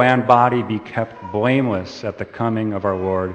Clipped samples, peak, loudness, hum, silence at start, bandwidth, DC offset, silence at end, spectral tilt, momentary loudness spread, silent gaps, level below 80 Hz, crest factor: under 0.1%; 0 dBFS; -19 LUFS; none; 0 s; 8.6 kHz; under 0.1%; 0 s; -7.5 dB/octave; 12 LU; none; -56 dBFS; 18 dB